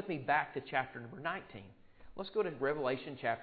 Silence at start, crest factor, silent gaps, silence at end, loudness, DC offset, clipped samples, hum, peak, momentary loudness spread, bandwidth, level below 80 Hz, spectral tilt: 0 s; 20 dB; none; 0 s; -37 LUFS; under 0.1%; under 0.1%; none; -18 dBFS; 15 LU; 4.8 kHz; -70 dBFS; -3.5 dB/octave